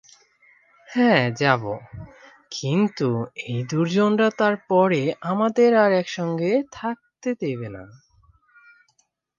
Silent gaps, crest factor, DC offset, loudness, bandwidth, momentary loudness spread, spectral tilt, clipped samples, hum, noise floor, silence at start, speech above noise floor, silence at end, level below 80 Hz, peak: none; 20 dB; under 0.1%; -22 LUFS; 7.4 kHz; 14 LU; -6.5 dB/octave; under 0.1%; none; -67 dBFS; 0.9 s; 46 dB; 1.5 s; -60 dBFS; -2 dBFS